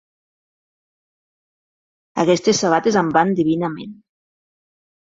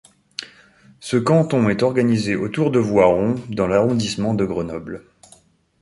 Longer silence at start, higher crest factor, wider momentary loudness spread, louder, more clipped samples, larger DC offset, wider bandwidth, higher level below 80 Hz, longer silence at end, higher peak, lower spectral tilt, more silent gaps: first, 2.15 s vs 0.4 s; about the same, 20 dB vs 18 dB; second, 13 LU vs 17 LU; about the same, -17 LUFS vs -19 LUFS; neither; neither; second, 7.8 kHz vs 11.5 kHz; second, -62 dBFS vs -48 dBFS; first, 1.15 s vs 0.85 s; about the same, -2 dBFS vs -2 dBFS; second, -5 dB/octave vs -6.5 dB/octave; neither